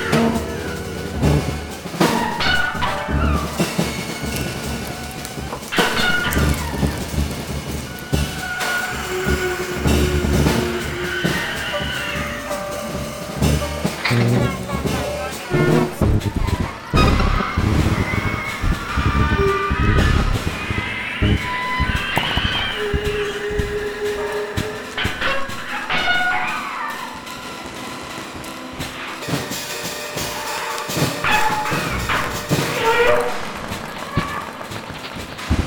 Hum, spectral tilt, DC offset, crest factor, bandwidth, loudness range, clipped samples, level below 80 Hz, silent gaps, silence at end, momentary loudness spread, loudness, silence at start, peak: none; -4.5 dB/octave; under 0.1%; 18 dB; 19 kHz; 4 LU; under 0.1%; -28 dBFS; none; 0 s; 11 LU; -21 LUFS; 0 s; -2 dBFS